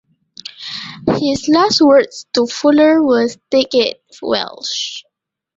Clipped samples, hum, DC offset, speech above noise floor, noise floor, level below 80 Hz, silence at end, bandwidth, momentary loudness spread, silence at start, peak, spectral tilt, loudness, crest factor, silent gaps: under 0.1%; none; under 0.1%; 23 dB; -37 dBFS; -52 dBFS; 0.55 s; 7.8 kHz; 16 LU; 0.6 s; -2 dBFS; -4 dB/octave; -14 LUFS; 14 dB; none